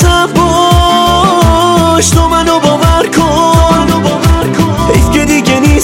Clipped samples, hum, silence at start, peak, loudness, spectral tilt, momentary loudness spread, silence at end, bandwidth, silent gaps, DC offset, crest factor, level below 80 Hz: 1%; none; 0 s; 0 dBFS; -8 LUFS; -5 dB/octave; 3 LU; 0 s; 17 kHz; none; under 0.1%; 8 dB; -16 dBFS